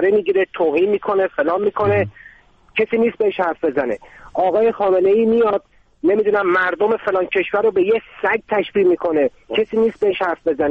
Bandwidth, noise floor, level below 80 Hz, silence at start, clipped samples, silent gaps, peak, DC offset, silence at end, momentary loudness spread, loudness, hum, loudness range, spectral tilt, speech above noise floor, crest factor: 5.2 kHz; -47 dBFS; -54 dBFS; 0 s; under 0.1%; none; -6 dBFS; under 0.1%; 0 s; 5 LU; -18 LUFS; none; 3 LU; -8 dB/octave; 30 dB; 12 dB